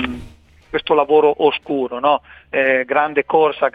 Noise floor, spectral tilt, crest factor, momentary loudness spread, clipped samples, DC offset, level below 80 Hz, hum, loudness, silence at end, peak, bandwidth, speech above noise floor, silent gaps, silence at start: -43 dBFS; -6.5 dB/octave; 16 dB; 11 LU; under 0.1%; under 0.1%; -48 dBFS; none; -17 LUFS; 0.05 s; 0 dBFS; 4.9 kHz; 27 dB; none; 0 s